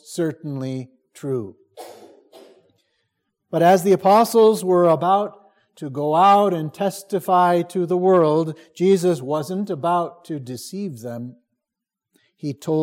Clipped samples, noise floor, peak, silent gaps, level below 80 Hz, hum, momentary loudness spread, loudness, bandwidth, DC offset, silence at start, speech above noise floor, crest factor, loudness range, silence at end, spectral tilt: under 0.1%; -85 dBFS; -4 dBFS; none; -74 dBFS; none; 17 LU; -19 LUFS; 16.5 kHz; under 0.1%; 0.1 s; 66 dB; 16 dB; 11 LU; 0 s; -6.5 dB/octave